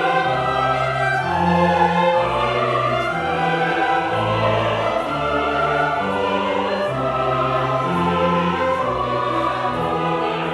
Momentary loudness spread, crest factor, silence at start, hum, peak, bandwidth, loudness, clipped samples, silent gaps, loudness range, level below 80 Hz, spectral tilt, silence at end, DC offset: 4 LU; 16 dB; 0 s; none; -2 dBFS; 12 kHz; -19 LUFS; under 0.1%; none; 2 LU; -44 dBFS; -6 dB/octave; 0 s; under 0.1%